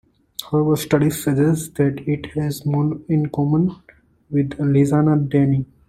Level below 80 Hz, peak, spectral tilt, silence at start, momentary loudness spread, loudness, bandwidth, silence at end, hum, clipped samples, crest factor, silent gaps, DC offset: -50 dBFS; -2 dBFS; -7.5 dB/octave; 0.4 s; 7 LU; -19 LUFS; 16 kHz; 0.25 s; none; under 0.1%; 16 dB; none; under 0.1%